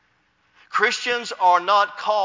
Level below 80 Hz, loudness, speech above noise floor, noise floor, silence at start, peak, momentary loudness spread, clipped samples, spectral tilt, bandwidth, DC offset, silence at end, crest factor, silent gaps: -78 dBFS; -20 LUFS; 44 dB; -64 dBFS; 0.7 s; -4 dBFS; 7 LU; under 0.1%; -1 dB/octave; 7.6 kHz; under 0.1%; 0 s; 18 dB; none